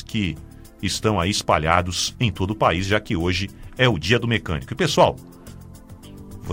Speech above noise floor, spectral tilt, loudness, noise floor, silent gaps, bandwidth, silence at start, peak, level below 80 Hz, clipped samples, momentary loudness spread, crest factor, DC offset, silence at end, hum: 20 dB; -4.5 dB/octave; -21 LUFS; -41 dBFS; none; 16 kHz; 0 s; -2 dBFS; -40 dBFS; under 0.1%; 19 LU; 22 dB; under 0.1%; 0 s; none